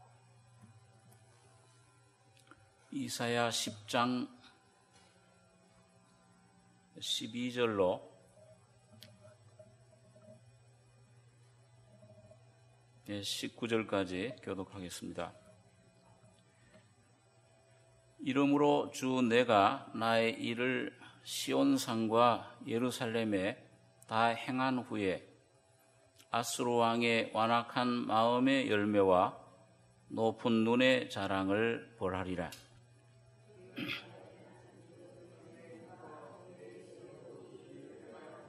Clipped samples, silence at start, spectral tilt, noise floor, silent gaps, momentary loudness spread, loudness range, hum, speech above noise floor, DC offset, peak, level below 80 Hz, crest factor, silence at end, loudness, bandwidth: under 0.1%; 2.9 s; -4.5 dB/octave; -67 dBFS; none; 24 LU; 17 LU; none; 34 dB; under 0.1%; -14 dBFS; -76 dBFS; 24 dB; 0 s; -33 LUFS; 13 kHz